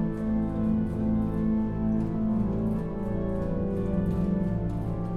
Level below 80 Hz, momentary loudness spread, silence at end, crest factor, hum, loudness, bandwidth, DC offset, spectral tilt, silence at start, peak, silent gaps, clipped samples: -36 dBFS; 3 LU; 0 s; 12 dB; none; -28 LUFS; 4.2 kHz; under 0.1%; -10.5 dB/octave; 0 s; -16 dBFS; none; under 0.1%